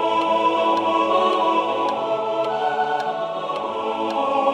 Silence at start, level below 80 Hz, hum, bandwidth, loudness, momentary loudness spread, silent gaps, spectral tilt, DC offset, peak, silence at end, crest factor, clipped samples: 0 s; -68 dBFS; none; 11 kHz; -21 LUFS; 7 LU; none; -4.5 dB/octave; under 0.1%; -6 dBFS; 0 s; 14 dB; under 0.1%